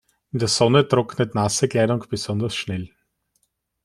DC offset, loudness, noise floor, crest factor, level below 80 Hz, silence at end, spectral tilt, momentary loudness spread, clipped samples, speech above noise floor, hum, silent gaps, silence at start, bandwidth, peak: under 0.1%; -21 LUFS; -70 dBFS; 20 dB; -54 dBFS; 1 s; -5 dB/octave; 13 LU; under 0.1%; 50 dB; none; none; 0.35 s; 13 kHz; -2 dBFS